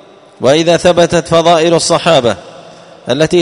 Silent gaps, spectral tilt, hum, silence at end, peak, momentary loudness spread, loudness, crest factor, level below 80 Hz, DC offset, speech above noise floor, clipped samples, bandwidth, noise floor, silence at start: none; -4.5 dB/octave; none; 0 s; 0 dBFS; 9 LU; -10 LUFS; 10 dB; -42 dBFS; 0.1%; 26 dB; 0.4%; 11 kHz; -35 dBFS; 0.4 s